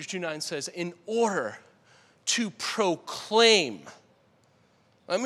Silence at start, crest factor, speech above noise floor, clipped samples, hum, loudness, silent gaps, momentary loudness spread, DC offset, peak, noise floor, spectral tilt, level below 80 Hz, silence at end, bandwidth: 0 s; 24 dB; 37 dB; under 0.1%; none; -26 LUFS; none; 14 LU; under 0.1%; -6 dBFS; -64 dBFS; -2.5 dB/octave; -84 dBFS; 0 s; 14 kHz